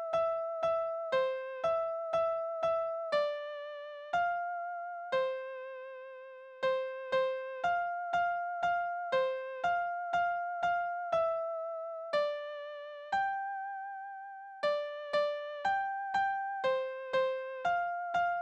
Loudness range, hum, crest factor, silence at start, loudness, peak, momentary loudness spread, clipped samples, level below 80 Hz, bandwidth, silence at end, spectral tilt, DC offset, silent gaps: 3 LU; none; 14 dB; 0 s; -34 LUFS; -20 dBFS; 10 LU; under 0.1%; -74 dBFS; 8.4 kHz; 0 s; -3.5 dB/octave; under 0.1%; none